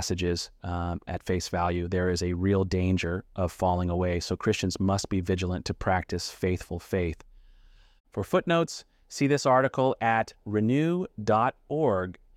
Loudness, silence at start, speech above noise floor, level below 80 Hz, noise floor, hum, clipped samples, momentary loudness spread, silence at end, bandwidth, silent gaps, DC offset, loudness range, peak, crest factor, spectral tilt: -28 LUFS; 0 s; 28 dB; -48 dBFS; -55 dBFS; none; under 0.1%; 8 LU; 0.25 s; 15.5 kHz; 8.00-8.04 s; under 0.1%; 5 LU; -10 dBFS; 18 dB; -6 dB/octave